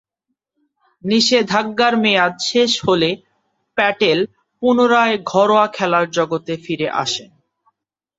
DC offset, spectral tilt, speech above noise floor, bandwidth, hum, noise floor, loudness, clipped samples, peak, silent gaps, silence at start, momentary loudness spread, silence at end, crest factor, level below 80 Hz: under 0.1%; -4 dB/octave; 61 dB; 8 kHz; none; -77 dBFS; -16 LUFS; under 0.1%; -2 dBFS; none; 1.05 s; 10 LU; 0.95 s; 16 dB; -60 dBFS